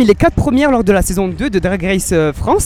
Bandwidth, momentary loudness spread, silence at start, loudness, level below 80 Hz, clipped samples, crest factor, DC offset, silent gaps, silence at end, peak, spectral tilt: 17 kHz; 5 LU; 0 s; -14 LUFS; -26 dBFS; under 0.1%; 12 dB; under 0.1%; none; 0 s; 0 dBFS; -5.5 dB/octave